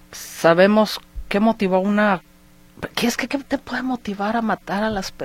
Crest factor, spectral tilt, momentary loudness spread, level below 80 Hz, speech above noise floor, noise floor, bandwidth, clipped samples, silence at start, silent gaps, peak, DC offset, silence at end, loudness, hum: 20 dB; -5 dB/octave; 11 LU; -44 dBFS; 29 dB; -49 dBFS; 16.5 kHz; under 0.1%; 0.1 s; none; -2 dBFS; under 0.1%; 0 s; -20 LUFS; none